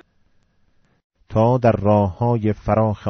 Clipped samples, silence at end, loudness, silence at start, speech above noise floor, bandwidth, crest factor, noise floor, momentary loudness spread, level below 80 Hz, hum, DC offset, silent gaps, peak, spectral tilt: under 0.1%; 0 s; -18 LUFS; 1.3 s; 43 dB; 6.2 kHz; 16 dB; -60 dBFS; 5 LU; -42 dBFS; none; under 0.1%; none; -4 dBFS; -8.5 dB/octave